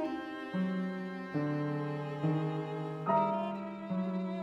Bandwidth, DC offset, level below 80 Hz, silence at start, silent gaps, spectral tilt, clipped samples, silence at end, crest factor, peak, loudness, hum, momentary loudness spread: 7.6 kHz; under 0.1%; -74 dBFS; 0 s; none; -9 dB/octave; under 0.1%; 0 s; 16 dB; -18 dBFS; -35 LUFS; none; 8 LU